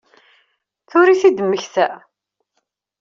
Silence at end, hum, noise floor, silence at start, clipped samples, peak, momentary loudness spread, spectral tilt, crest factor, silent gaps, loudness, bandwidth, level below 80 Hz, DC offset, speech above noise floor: 1.05 s; none; -72 dBFS; 0.95 s; under 0.1%; -2 dBFS; 9 LU; -3.5 dB/octave; 16 dB; none; -16 LUFS; 7.4 kHz; -68 dBFS; under 0.1%; 58 dB